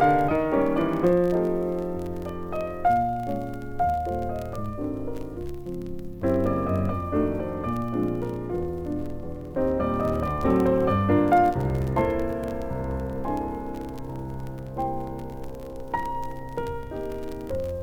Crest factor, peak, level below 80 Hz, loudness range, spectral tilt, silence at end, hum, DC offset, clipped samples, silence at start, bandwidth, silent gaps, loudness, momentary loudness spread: 18 dB; -8 dBFS; -40 dBFS; 9 LU; -8.5 dB/octave; 0 s; none; under 0.1%; under 0.1%; 0 s; 18.5 kHz; none; -27 LUFS; 13 LU